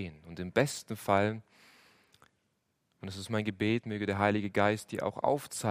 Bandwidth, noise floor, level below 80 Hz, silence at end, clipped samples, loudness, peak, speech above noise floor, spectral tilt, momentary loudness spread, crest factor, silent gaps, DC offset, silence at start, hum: 15.5 kHz; -78 dBFS; -70 dBFS; 0 s; under 0.1%; -32 LUFS; -10 dBFS; 47 dB; -5.5 dB/octave; 14 LU; 22 dB; none; under 0.1%; 0 s; none